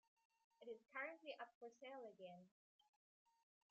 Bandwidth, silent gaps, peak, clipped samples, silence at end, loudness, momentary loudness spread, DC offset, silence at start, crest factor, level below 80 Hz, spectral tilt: 7.4 kHz; 1.55-1.61 s; -38 dBFS; under 0.1%; 1.2 s; -56 LUFS; 10 LU; under 0.1%; 0.6 s; 22 dB; under -90 dBFS; -1.5 dB/octave